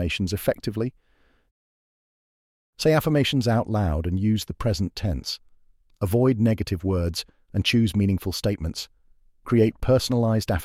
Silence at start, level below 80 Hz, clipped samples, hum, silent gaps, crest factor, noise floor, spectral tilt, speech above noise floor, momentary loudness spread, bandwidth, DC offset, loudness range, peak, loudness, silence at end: 0 s; -40 dBFS; under 0.1%; none; 1.51-2.73 s; 16 dB; -57 dBFS; -6 dB/octave; 34 dB; 10 LU; 16 kHz; under 0.1%; 2 LU; -8 dBFS; -24 LUFS; 0 s